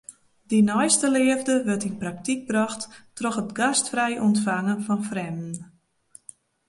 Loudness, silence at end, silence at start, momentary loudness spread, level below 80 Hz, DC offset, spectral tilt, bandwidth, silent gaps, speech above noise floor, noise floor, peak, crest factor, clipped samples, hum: -23 LUFS; 1.05 s; 0.1 s; 12 LU; -66 dBFS; under 0.1%; -4 dB/octave; 11.5 kHz; none; 31 dB; -55 dBFS; -6 dBFS; 18 dB; under 0.1%; none